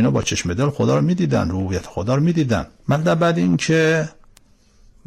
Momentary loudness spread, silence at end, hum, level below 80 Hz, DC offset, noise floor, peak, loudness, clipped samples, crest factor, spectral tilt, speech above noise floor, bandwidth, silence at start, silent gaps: 7 LU; 0.95 s; none; -44 dBFS; under 0.1%; -52 dBFS; -10 dBFS; -19 LUFS; under 0.1%; 10 dB; -6 dB/octave; 34 dB; 12.5 kHz; 0 s; none